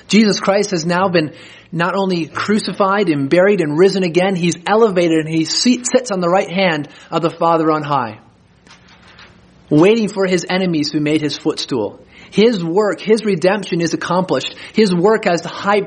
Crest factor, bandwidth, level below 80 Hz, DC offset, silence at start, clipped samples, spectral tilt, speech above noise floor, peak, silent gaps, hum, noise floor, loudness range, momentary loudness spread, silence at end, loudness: 16 dB; 10 kHz; -58 dBFS; under 0.1%; 0.1 s; under 0.1%; -5 dB/octave; 31 dB; 0 dBFS; none; none; -46 dBFS; 4 LU; 7 LU; 0 s; -15 LUFS